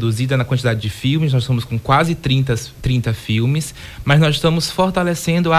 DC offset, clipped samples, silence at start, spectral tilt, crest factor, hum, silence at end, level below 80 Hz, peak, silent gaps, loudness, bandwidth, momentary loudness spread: under 0.1%; under 0.1%; 0 s; -6 dB/octave; 14 dB; none; 0 s; -38 dBFS; -2 dBFS; none; -17 LUFS; 15.5 kHz; 6 LU